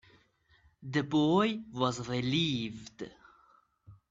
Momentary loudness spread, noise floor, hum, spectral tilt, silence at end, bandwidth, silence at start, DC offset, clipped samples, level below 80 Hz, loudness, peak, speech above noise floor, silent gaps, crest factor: 19 LU; -67 dBFS; none; -5.5 dB/octave; 0.15 s; 7.8 kHz; 0.8 s; under 0.1%; under 0.1%; -66 dBFS; -31 LUFS; -14 dBFS; 36 dB; none; 20 dB